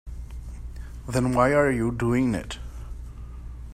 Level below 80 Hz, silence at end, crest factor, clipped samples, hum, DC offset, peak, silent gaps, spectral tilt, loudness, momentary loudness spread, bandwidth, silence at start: -38 dBFS; 0 s; 20 dB; under 0.1%; none; under 0.1%; -6 dBFS; none; -6.5 dB/octave; -23 LUFS; 20 LU; 14.5 kHz; 0.05 s